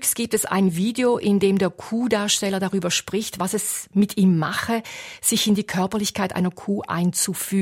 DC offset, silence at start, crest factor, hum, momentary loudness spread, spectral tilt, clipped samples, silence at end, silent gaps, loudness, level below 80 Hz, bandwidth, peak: under 0.1%; 0 s; 16 dB; none; 6 LU; -4 dB/octave; under 0.1%; 0 s; none; -22 LUFS; -58 dBFS; 16.5 kHz; -6 dBFS